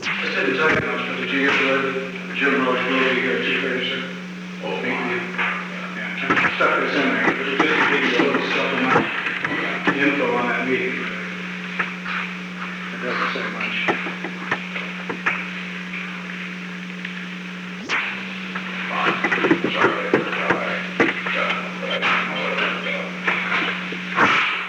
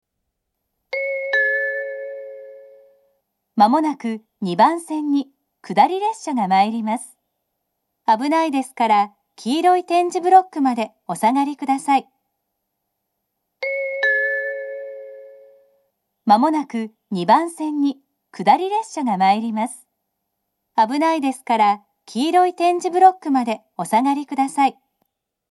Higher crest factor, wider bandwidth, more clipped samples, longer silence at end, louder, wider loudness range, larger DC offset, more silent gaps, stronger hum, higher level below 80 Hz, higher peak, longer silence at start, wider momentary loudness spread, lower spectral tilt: about the same, 20 dB vs 20 dB; second, 10.5 kHz vs 12.5 kHz; neither; second, 0 s vs 0.8 s; about the same, -21 LUFS vs -19 LUFS; about the same, 7 LU vs 5 LU; neither; neither; neither; first, -62 dBFS vs -80 dBFS; about the same, -2 dBFS vs 0 dBFS; second, 0 s vs 0.9 s; about the same, 11 LU vs 13 LU; about the same, -5 dB/octave vs -4.5 dB/octave